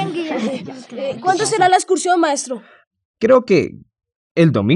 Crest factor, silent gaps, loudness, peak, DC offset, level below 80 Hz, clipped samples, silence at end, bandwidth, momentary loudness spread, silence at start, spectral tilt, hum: 16 dB; 2.87-2.91 s, 3.05-3.14 s, 4.16-4.35 s; -17 LUFS; -2 dBFS; under 0.1%; -66 dBFS; under 0.1%; 0 s; 11.5 kHz; 14 LU; 0 s; -5 dB/octave; none